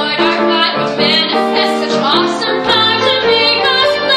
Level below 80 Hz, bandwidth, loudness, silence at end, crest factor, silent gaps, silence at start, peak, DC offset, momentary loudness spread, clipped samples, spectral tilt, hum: -52 dBFS; 13.5 kHz; -11 LUFS; 0 s; 12 dB; none; 0 s; 0 dBFS; under 0.1%; 4 LU; under 0.1%; -3.5 dB/octave; none